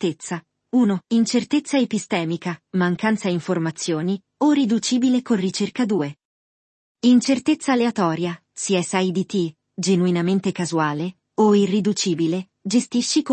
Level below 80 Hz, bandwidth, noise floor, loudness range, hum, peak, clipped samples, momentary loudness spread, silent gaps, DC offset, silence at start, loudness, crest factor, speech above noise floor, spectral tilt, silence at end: -68 dBFS; 8.8 kHz; under -90 dBFS; 1 LU; none; -6 dBFS; under 0.1%; 9 LU; 6.25-6.95 s; under 0.1%; 0 s; -21 LUFS; 16 dB; over 70 dB; -5 dB/octave; 0 s